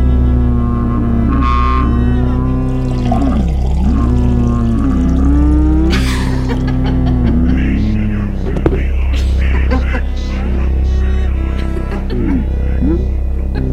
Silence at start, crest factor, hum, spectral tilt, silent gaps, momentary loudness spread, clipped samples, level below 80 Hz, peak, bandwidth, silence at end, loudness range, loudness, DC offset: 0 s; 12 dB; none; -8 dB/octave; none; 6 LU; under 0.1%; -14 dBFS; 0 dBFS; 8.6 kHz; 0 s; 3 LU; -15 LUFS; under 0.1%